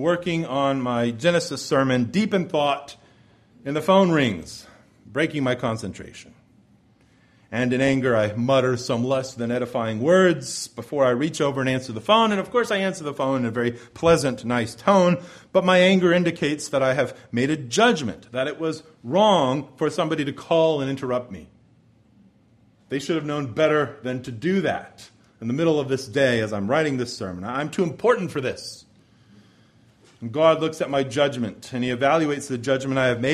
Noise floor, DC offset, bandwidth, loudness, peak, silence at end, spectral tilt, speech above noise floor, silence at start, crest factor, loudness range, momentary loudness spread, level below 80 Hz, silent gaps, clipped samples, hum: -58 dBFS; under 0.1%; 13.5 kHz; -22 LUFS; -4 dBFS; 0 s; -5.5 dB/octave; 36 dB; 0 s; 20 dB; 6 LU; 11 LU; -58 dBFS; none; under 0.1%; none